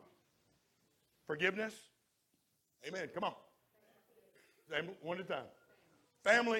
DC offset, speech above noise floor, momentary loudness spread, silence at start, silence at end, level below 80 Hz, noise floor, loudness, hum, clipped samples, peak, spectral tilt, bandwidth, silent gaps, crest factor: under 0.1%; 43 dB; 23 LU; 1.3 s; 0 s; -84 dBFS; -80 dBFS; -39 LUFS; none; under 0.1%; -16 dBFS; -4 dB/octave; 16.5 kHz; none; 26 dB